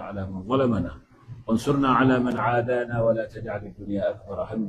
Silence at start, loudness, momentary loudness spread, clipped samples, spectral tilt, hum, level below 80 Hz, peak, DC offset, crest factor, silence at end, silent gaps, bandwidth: 0 s; -25 LUFS; 14 LU; under 0.1%; -7.5 dB/octave; none; -48 dBFS; -8 dBFS; under 0.1%; 18 dB; 0 s; none; 12.5 kHz